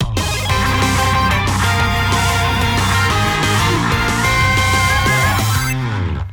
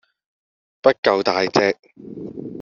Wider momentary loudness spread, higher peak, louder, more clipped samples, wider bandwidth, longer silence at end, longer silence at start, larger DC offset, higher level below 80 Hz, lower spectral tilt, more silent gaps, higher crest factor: second, 4 LU vs 17 LU; second, -4 dBFS vs 0 dBFS; first, -15 LUFS vs -18 LUFS; neither; first, over 20 kHz vs 7.4 kHz; about the same, 0 s vs 0 s; second, 0 s vs 0.85 s; neither; first, -26 dBFS vs -62 dBFS; first, -4 dB/octave vs -2.5 dB/octave; second, none vs 0.98-1.03 s, 1.79-1.83 s; second, 12 dB vs 22 dB